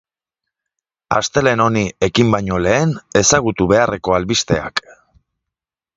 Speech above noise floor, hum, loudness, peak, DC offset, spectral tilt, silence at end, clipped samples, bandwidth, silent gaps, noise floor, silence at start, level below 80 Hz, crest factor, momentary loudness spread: 69 dB; none; -16 LUFS; 0 dBFS; under 0.1%; -4 dB/octave; 1.15 s; under 0.1%; 9.6 kHz; none; -85 dBFS; 1.1 s; -40 dBFS; 18 dB; 5 LU